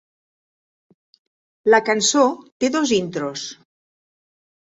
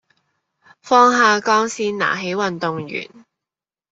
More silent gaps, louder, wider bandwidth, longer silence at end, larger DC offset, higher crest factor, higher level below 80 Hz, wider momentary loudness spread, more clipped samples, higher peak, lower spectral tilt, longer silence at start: first, 2.52-2.60 s vs none; about the same, -19 LUFS vs -17 LUFS; about the same, 8 kHz vs 8.2 kHz; first, 1.15 s vs 0.9 s; neither; about the same, 20 dB vs 18 dB; about the same, -66 dBFS vs -66 dBFS; second, 12 LU vs 15 LU; neither; about the same, -2 dBFS vs -2 dBFS; about the same, -2.5 dB/octave vs -3.5 dB/octave; first, 1.65 s vs 0.85 s